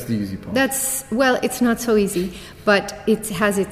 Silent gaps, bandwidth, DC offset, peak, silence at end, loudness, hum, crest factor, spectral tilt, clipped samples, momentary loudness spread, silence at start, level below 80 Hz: none; 16 kHz; under 0.1%; -4 dBFS; 0 s; -20 LUFS; none; 16 dB; -4 dB/octave; under 0.1%; 7 LU; 0 s; -46 dBFS